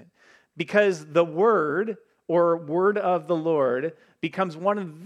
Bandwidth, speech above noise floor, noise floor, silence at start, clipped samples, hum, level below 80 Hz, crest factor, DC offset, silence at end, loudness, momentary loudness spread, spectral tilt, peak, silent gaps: 10 kHz; 35 dB; -58 dBFS; 0.55 s; under 0.1%; none; -80 dBFS; 18 dB; under 0.1%; 0 s; -24 LUFS; 11 LU; -6.5 dB/octave; -6 dBFS; none